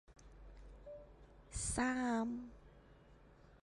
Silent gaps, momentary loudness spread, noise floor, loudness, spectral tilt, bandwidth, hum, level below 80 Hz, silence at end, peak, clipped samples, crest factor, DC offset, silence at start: none; 25 LU; -63 dBFS; -40 LUFS; -4 dB/octave; 11.5 kHz; none; -56 dBFS; 0.05 s; -24 dBFS; under 0.1%; 20 dB; under 0.1%; 0.1 s